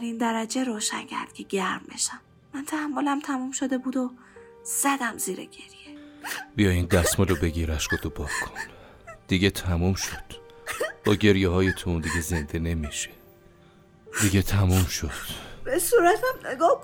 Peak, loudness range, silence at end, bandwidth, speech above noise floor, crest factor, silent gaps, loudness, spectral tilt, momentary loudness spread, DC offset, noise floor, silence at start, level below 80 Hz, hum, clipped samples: -6 dBFS; 4 LU; 0 s; 18 kHz; 29 dB; 20 dB; none; -26 LUFS; -4.5 dB/octave; 16 LU; under 0.1%; -54 dBFS; 0 s; -42 dBFS; none; under 0.1%